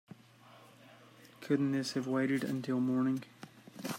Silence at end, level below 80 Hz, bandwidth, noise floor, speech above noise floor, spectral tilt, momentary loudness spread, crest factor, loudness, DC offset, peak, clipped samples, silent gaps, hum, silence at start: 0 s; -80 dBFS; 16 kHz; -59 dBFS; 27 dB; -6 dB/octave; 20 LU; 18 dB; -34 LUFS; under 0.1%; -18 dBFS; under 0.1%; none; none; 0.5 s